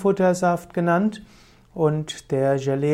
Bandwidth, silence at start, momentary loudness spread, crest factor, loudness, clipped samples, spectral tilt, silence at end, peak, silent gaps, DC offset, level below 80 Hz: 14 kHz; 0 s; 8 LU; 14 dB; -22 LUFS; under 0.1%; -6.5 dB/octave; 0 s; -8 dBFS; none; under 0.1%; -56 dBFS